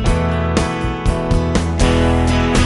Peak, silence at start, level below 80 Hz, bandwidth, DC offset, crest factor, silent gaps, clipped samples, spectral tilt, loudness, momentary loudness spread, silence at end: -2 dBFS; 0 s; -20 dBFS; 11.5 kHz; under 0.1%; 14 dB; none; under 0.1%; -6 dB/octave; -17 LUFS; 5 LU; 0 s